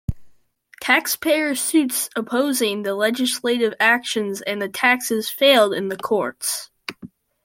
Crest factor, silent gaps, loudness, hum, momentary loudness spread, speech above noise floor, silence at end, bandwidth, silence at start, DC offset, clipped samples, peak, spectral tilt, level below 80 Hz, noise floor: 20 dB; none; -20 LUFS; none; 9 LU; 33 dB; 0.4 s; 16.5 kHz; 0.1 s; under 0.1%; under 0.1%; -2 dBFS; -2.5 dB/octave; -48 dBFS; -53 dBFS